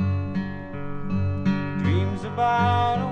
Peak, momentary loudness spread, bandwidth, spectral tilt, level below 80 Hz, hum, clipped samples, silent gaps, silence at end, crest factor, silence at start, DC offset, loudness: -10 dBFS; 12 LU; 7 kHz; -8 dB/octave; -46 dBFS; none; under 0.1%; none; 0 s; 14 dB; 0 s; under 0.1%; -25 LUFS